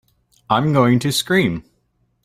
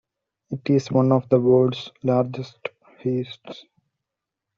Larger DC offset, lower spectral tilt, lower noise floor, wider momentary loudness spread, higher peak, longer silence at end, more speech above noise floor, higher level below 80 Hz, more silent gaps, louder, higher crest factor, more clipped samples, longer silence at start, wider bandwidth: neither; second, -5.5 dB/octave vs -7.5 dB/octave; second, -65 dBFS vs -85 dBFS; second, 7 LU vs 18 LU; first, 0 dBFS vs -4 dBFS; second, 0.65 s vs 1 s; second, 49 dB vs 64 dB; first, -52 dBFS vs -64 dBFS; neither; first, -17 LUFS vs -22 LUFS; about the same, 18 dB vs 18 dB; neither; about the same, 0.5 s vs 0.5 s; first, 16 kHz vs 7.2 kHz